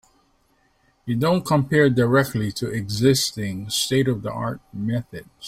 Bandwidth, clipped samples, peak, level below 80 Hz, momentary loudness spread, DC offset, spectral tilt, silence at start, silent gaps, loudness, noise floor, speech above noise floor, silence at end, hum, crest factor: 16 kHz; under 0.1%; -4 dBFS; -52 dBFS; 12 LU; under 0.1%; -5 dB/octave; 1.05 s; none; -22 LUFS; -63 dBFS; 42 dB; 0 s; none; 18 dB